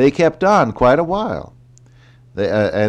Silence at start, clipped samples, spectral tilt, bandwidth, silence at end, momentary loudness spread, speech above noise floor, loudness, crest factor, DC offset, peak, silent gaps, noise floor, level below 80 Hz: 0 s; under 0.1%; -6.5 dB/octave; 9.4 kHz; 0 s; 12 LU; 31 dB; -16 LUFS; 14 dB; under 0.1%; -4 dBFS; none; -46 dBFS; -42 dBFS